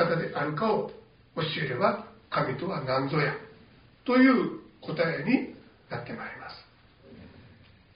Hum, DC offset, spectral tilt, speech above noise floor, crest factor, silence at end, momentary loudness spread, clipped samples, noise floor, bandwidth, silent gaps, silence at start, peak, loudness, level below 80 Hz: none; under 0.1%; -4.5 dB/octave; 29 dB; 20 dB; 0.5 s; 18 LU; under 0.1%; -56 dBFS; 5.2 kHz; none; 0 s; -10 dBFS; -28 LUFS; -64 dBFS